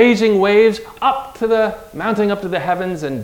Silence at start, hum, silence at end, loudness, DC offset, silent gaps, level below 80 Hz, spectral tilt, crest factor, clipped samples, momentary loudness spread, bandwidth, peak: 0 s; none; 0 s; -16 LUFS; under 0.1%; none; -48 dBFS; -6 dB/octave; 16 dB; under 0.1%; 9 LU; 16.5 kHz; 0 dBFS